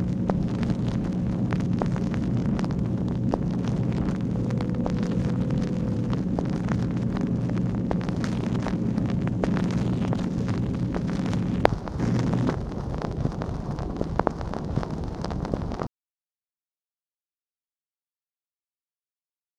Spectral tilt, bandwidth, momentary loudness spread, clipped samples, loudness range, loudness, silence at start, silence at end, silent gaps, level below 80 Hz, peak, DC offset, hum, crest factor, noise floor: -8.5 dB/octave; 9.6 kHz; 5 LU; under 0.1%; 7 LU; -27 LUFS; 0 s; 3.7 s; none; -38 dBFS; 0 dBFS; under 0.1%; none; 26 dB; under -90 dBFS